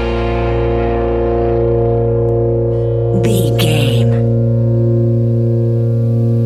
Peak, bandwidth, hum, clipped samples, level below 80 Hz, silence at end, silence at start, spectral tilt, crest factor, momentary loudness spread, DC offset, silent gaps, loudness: -2 dBFS; 13 kHz; none; under 0.1%; -26 dBFS; 0 s; 0 s; -7.5 dB/octave; 12 dB; 3 LU; under 0.1%; none; -14 LUFS